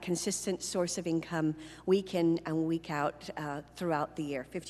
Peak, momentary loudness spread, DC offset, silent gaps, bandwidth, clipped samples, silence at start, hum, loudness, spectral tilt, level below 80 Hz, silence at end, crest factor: -16 dBFS; 8 LU; under 0.1%; none; 13 kHz; under 0.1%; 0 s; none; -33 LUFS; -5 dB/octave; -64 dBFS; 0 s; 18 dB